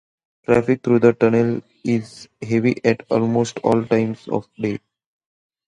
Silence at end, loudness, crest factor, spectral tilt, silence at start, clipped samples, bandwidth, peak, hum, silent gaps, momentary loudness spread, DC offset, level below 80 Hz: 0.9 s; -19 LUFS; 20 dB; -7.5 dB/octave; 0.5 s; under 0.1%; 10 kHz; 0 dBFS; none; none; 11 LU; under 0.1%; -56 dBFS